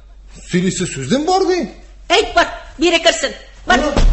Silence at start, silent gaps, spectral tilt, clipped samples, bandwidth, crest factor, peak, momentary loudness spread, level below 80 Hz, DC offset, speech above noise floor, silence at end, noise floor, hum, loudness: 0.1 s; none; -4 dB/octave; under 0.1%; 8.6 kHz; 16 dB; 0 dBFS; 9 LU; -26 dBFS; under 0.1%; 23 dB; 0 s; -37 dBFS; none; -16 LUFS